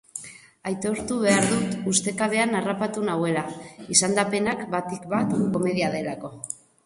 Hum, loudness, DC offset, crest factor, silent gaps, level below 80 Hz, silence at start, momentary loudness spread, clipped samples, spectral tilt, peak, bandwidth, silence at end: none; -24 LUFS; under 0.1%; 24 dB; none; -60 dBFS; 0.15 s; 15 LU; under 0.1%; -4 dB/octave; -2 dBFS; 11.5 kHz; 0.3 s